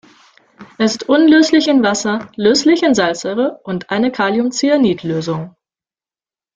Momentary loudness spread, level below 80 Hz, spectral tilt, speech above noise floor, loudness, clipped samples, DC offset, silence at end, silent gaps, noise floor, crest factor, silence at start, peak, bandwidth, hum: 10 LU; -56 dBFS; -4.5 dB/octave; over 76 dB; -14 LUFS; under 0.1%; under 0.1%; 1.05 s; none; under -90 dBFS; 14 dB; 0.6 s; 0 dBFS; 9 kHz; none